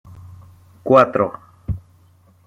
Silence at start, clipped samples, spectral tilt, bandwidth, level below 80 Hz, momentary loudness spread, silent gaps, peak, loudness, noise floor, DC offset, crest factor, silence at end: 0.15 s; under 0.1%; -8 dB/octave; 8.4 kHz; -42 dBFS; 19 LU; none; -2 dBFS; -17 LUFS; -53 dBFS; under 0.1%; 20 dB; 0.7 s